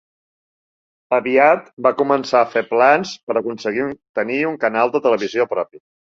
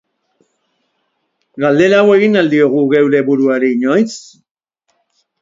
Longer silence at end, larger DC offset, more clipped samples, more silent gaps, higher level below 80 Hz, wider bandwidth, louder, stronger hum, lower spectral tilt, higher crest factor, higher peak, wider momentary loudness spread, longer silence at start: second, 0.45 s vs 1.2 s; neither; neither; first, 1.73-1.77 s, 3.23-3.27 s, 4.09-4.14 s vs none; second, -66 dBFS vs -60 dBFS; about the same, 7.6 kHz vs 7.8 kHz; second, -18 LUFS vs -12 LUFS; neither; about the same, -5 dB/octave vs -6 dB/octave; about the same, 18 dB vs 14 dB; about the same, -2 dBFS vs 0 dBFS; about the same, 9 LU vs 7 LU; second, 1.1 s vs 1.55 s